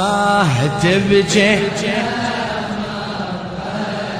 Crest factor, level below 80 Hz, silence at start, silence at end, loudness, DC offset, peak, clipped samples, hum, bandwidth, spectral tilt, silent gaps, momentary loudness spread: 16 dB; -44 dBFS; 0 s; 0 s; -17 LUFS; under 0.1%; -2 dBFS; under 0.1%; none; 14 kHz; -5 dB/octave; none; 11 LU